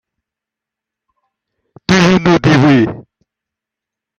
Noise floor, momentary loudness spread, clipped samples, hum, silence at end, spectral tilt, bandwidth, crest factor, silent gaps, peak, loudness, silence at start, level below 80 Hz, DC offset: -84 dBFS; 14 LU; under 0.1%; none; 1.15 s; -6 dB/octave; 8.4 kHz; 14 dB; none; 0 dBFS; -10 LUFS; 1.9 s; -44 dBFS; under 0.1%